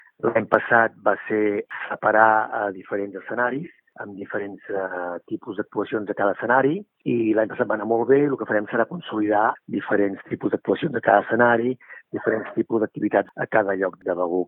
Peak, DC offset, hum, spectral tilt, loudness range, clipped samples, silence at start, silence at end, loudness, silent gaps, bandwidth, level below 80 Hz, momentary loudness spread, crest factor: 0 dBFS; under 0.1%; none; -10 dB/octave; 6 LU; under 0.1%; 0.25 s; 0 s; -22 LUFS; none; 4 kHz; -70 dBFS; 12 LU; 22 dB